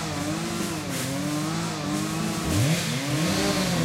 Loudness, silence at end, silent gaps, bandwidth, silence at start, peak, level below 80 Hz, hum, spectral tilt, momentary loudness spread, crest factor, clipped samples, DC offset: -26 LUFS; 0 s; none; 16 kHz; 0 s; -12 dBFS; -48 dBFS; none; -4.5 dB/octave; 5 LU; 14 dB; under 0.1%; under 0.1%